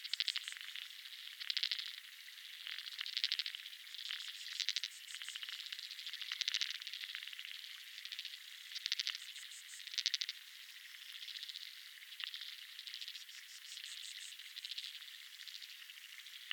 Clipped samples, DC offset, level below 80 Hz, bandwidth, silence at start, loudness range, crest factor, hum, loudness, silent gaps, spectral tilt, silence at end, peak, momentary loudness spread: under 0.1%; under 0.1%; under -90 dBFS; 19 kHz; 0 s; 6 LU; 32 dB; none; -43 LUFS; none; 9.5 dB/octave; 0 s; -14 dBFS; 13 LU